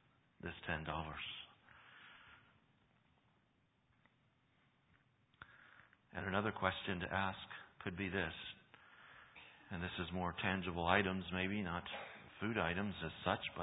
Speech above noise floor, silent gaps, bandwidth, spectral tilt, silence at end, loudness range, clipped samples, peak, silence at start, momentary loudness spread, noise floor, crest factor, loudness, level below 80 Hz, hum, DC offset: 36 dB; none; 3.9 kHz; -2 dB/octave; 0 s; 10 LU; under 0.1%; -16 dBFS; 0.45 s; 21 LU; -78 dBFS; 30 dB; -42 LUFS; -62 dBFS; none; under 0.1%